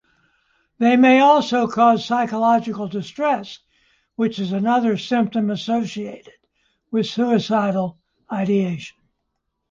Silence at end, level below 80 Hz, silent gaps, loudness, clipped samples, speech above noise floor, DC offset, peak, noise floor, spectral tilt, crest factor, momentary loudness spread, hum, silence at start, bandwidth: 0.8 s; -64 dBFS; none; -19 LUFS; under 0.1%; 57 dB; under 0.1%; -4 dBFS; -75 dBFS; -6.5 dB/octave; 16 dB; 15 LU; none; 0.8 s; 7.4 kHz